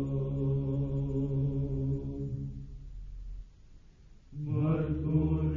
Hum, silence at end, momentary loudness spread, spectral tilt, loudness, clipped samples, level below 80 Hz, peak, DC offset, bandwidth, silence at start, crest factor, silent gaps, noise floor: none; 0 s; 18 LU; -11.5 dB/octave; -32 LUFS; under 0.1%; -44 dBFS; -16 dBFS; under 0.1%; 3.6 kHz; 0 s; 16 dB; none; -55 dBFS